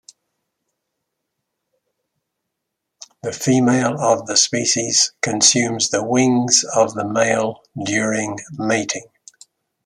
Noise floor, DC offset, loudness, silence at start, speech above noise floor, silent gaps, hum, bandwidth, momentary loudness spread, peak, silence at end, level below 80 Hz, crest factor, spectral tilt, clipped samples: -79 dBFS; under 0.1%; -17 LUFS; 3.25 s; 61 dB; none; none; 14 kHz; 12 LU; 0 dBFS; 0.85 s; -62 dBFS; 20 dB; -3 dB/octave; under 0.1%